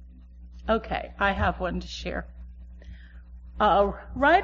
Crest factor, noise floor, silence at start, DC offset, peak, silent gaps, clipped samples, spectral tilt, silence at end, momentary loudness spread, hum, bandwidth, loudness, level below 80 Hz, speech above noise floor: 18 dB; -46 dBFS; 0 s; under 0.1%; -8 dBFS; none; under 0.1%; -3.5 dB/octave; 0 s; 25 LU; none; 7.4 kHz; -26 LUFS; -40 dBFS; 21 dB